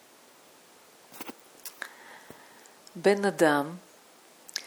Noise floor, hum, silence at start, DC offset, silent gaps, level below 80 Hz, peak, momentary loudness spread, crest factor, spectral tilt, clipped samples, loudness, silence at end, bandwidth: -56 dBFS; none; 1.15 s; under 0.1%; none; -82 dBFS; -8 dBFS; 26 LU; 24 dB; -4.5 dB/octave; under 0.1%; -27 LUFS; 0 s; over 20 kHz